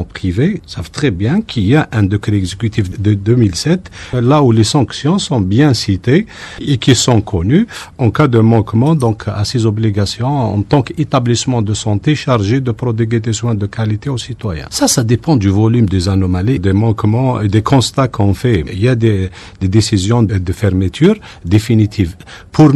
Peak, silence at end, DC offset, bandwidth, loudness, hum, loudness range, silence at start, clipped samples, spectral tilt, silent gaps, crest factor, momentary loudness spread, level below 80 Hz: 0 dBFS; 0 s; under 0.1%; 13 kHz; -13 LUFS; none; 2 LU; 0 s; under 0.1%; -6 dB/octave; none; 12 dB; 7 LU; -36 dBFS